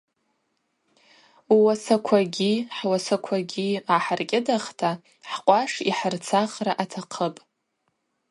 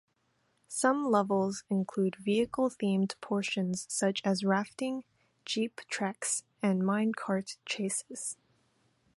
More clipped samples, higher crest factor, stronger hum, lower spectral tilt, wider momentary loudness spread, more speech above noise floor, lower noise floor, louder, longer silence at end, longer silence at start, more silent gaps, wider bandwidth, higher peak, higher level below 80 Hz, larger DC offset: neither; about the same, 22 dB vs 20 dB; neither; about the same, -4.5 dB/octave vs -4.5 dB/octave; about the same, 9 LU vs 8 LU; first, 51 dB vs 44 dB; about the same, -75 dBFS vs -75 dBFS; first, -24 LUFS vs -32 LUFS; about the same, 0.95 s vs 0.85 s; first, 1.5 s vs 0.7 s; neither; about the same, 11.5 kHz vs 11.5 kHz; first, -4 dBFS vs -12 dBFS; about the same, -74 dBFS vs -74 dBFS; neither